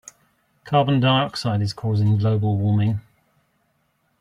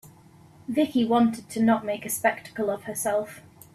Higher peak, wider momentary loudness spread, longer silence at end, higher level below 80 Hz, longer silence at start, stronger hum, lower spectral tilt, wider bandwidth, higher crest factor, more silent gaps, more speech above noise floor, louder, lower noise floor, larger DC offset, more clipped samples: about the same, -6 dBFS vs -8 dBFS; about the same, 6 LU vs 8 LU; first, 1.2 s vs 0.35 s; first, -56 dBFS vs -64 dBFS; first, 0.65 s vs 0.05 s; neither; first, -7 dB/octave vs -4.5 dB/octave; second, 10.5 kHz vs 15 kHz; about the same, 16 dB vs 18 dB; neither; first, 48 dB vs 28 dB; first, -21 LUFS vs -25 LUFS; first, -68 dBFS vs -52 dBFS; neither; neither